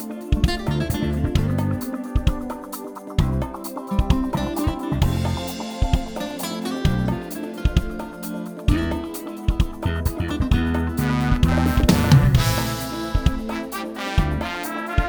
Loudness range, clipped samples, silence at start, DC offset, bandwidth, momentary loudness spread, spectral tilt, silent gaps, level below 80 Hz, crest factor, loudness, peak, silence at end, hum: 6 LU; under 0.1%; 0 s; under 0.1%; over 20 kHz; 11 LU; -6 dB/octave; none; -26 dBFS; 20 dB; -23 LUFS; -2 dBFS; 0 s; none